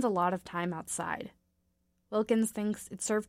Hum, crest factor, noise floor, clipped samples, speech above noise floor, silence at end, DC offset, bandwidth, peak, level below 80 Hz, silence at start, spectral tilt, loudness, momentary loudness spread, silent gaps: none; 18 dB; -76 dBFS; under 0.1%; 44 dB; 0.05 s; under 0.1%; 16 kHz; -16 dBFS; -68 dBFS; 0 s; -5 dB/octave; -33 LUFS; 8 LU; none